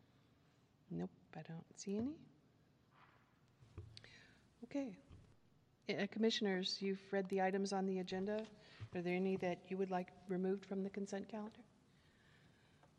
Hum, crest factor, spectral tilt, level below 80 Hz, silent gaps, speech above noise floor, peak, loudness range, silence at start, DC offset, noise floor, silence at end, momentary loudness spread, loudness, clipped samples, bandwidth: none; 18 dB; -5.5 dB/octave; -78 dBFS; none; 31 dB; -26 dBFS; 12 LU; 0.9 s; under 0.1%; -73 dBFS; 1.35 s; 19 LU; -43 LUFS; under 0.1%; 9.8 kHz